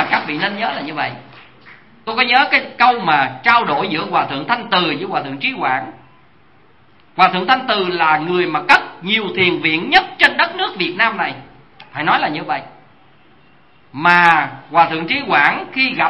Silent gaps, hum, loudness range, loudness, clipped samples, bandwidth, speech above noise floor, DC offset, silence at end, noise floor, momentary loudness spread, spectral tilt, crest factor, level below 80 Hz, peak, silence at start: none; none; 5 LU; -15 LUFS; under 0.1%; 11 kHz; 36 dB; 0.3%; 0 s; -51 dBFS; 10 LU; -5 dB/octave; 18 dB; -58 dBFS; 0 dBFS; 0 s